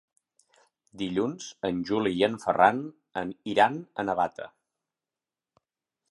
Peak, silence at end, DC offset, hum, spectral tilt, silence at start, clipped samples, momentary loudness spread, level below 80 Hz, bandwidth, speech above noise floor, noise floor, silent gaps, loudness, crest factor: -6 dBFS; 1.65 s; under 0.1%; none; -5 dB/octave; 0.95 s; under 0.1%; 13 LU; -64 dBFS; 11.5 kHz; over 63 dB; under -90 dBFS; none; -27 LUFS; 24 dB